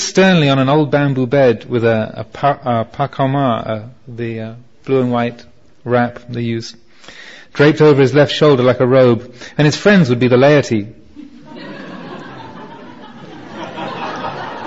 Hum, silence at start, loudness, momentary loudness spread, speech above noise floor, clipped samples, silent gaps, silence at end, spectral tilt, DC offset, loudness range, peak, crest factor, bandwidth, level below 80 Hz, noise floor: none; 0 s; -14 LUFS; 22 LU; 24 dB; under 0.1%; none; 0 s; -6.5 dB/octave; 0.7%; 9 LU; 0 dBFS; 14 dB; 8 kHz; -50 dBFS; -37 dBFS